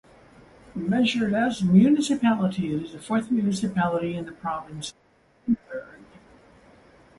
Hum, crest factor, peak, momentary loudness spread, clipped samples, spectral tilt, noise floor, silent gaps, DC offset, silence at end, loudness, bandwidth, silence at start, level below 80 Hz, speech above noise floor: none; 18 dB; -6 dBFS; 17 LU; under 0.1%; -6 dB/octave; -54 dBFS; none; under 0.1%; 1.15 s; -24 LUFS; 11.5 kHz; 0.75 s; -58 dBFS; 30 dB